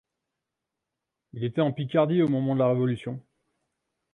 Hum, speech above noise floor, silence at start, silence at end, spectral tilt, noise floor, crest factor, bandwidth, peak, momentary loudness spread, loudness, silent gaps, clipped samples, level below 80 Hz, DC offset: none; 61 dB; 1.35 s; 0.95 s; -9.5 dB/octave; -85 dBFS; 18 dB; 9.2 kHz; -10 dBFS; 14 LU; -25 LUFS; none; under 0.1%; -68 dBFS; under 0.1%